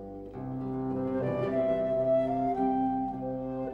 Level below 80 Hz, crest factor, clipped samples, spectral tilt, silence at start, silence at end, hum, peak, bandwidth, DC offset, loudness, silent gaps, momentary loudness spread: -54 dBFS; 12 dB; under 0.1%; -10 dB/octave; 0 s; 0 s; 50 Hz at -55 dBFS; -18 dBFS; 5 kHz; under 0.1%; -30 LUFS; none; 9 LU